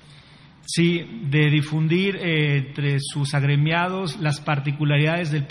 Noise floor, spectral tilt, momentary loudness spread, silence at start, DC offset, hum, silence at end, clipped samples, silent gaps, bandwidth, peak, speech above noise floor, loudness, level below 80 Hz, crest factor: -48 dBFS; -6 dB/octave; 5 LU; 0.1 s; under 0.1%; none; 0 s; under 0.1%; none; 11.5 kHz; -6 dBFS; 27 dB; -22 LUFS; -60 dBFS; 16 dB